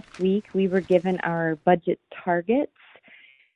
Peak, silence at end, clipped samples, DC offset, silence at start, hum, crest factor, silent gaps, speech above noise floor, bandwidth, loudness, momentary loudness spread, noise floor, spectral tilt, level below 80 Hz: -4 dBFS; 0.9 s; under 0.1%; under 0.1%; 0.15 s; none; 20 dB; none; 30 dB; 7.8 kHz; -24 LUFS; 6 LU; -53 dBFS; -8.5 dB/octave; -64 dBFS